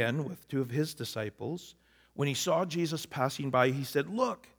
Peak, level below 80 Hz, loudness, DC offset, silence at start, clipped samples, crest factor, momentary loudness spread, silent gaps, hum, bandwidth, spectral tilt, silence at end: -10 dBFS; -72 dBFS; -32 LUFS; under 0.1%; 0 s; under 0.1%; 22 dB; 12 LU; none; none; over 20 kHz; -5 dB/octave; 0.2 s